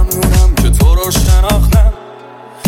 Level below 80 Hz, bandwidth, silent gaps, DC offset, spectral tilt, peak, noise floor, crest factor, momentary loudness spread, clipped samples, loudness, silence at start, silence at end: -10 dBFS; 17 kHz; none; under 0.1%; -5 dB/octave; 0 dBFS; -33 dBFS; 10 dB; 2 LU; under 0.1%; -11 LUFS; 0 s; 0 s